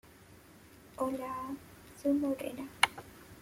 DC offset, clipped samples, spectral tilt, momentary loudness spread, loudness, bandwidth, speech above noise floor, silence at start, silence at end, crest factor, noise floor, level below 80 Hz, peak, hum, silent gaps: under 0.1%; under 0.1%; -3 dB/octave; 21 LU; -34 LUFS; 16.5 kHz; 22 dB; 0.05 s; 0 s; 28 dB; -57 dBFS; -66 dBFS; -10 dBFS; none; none